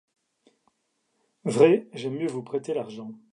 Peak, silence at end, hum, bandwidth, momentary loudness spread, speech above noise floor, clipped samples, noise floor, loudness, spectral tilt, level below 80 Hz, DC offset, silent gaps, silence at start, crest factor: -6 dBFS; 0.15 s; none; 11 kHz; 16 LU; 50 dB; under 0.1%; -75 dBFS; -25 LUFS; -6.5 dB/octave; -80 dBFS; under 0.1%; none; 1.45 s; 22 dB